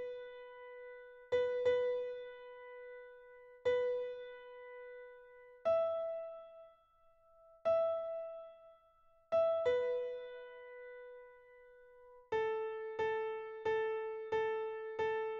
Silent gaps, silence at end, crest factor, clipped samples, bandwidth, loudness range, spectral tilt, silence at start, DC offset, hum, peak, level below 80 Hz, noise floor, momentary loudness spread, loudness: none; 0 s; 16 dB; under 0.1%; 7.2 kHz; 5 LU; -1.5 dB/octave; 0 s; under 0.1%; none; -24 dBFS; -76 dBFS; -68 dBFS; 20 LU; -38 LUFS